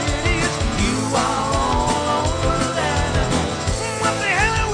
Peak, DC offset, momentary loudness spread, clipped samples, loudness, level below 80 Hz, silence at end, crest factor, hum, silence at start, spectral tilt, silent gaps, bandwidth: -6 dBFS; under 0.1%; 3 LU; under 0.1%; -20 LUFS; -28 dBFS; 0 s; 14 dB; none; 0 s; -4 dB/octave; none; 10 kHz